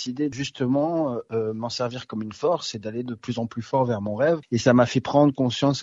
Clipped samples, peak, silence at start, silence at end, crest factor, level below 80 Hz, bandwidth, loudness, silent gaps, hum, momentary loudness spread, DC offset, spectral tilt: under 0.1%; -4 dBFS; 0 s; 0 s; 20 dB; -60 dBFS; 8 kHz; -24 LUFS; none; none; 11 LU; under 0.1%; -6 dB/octave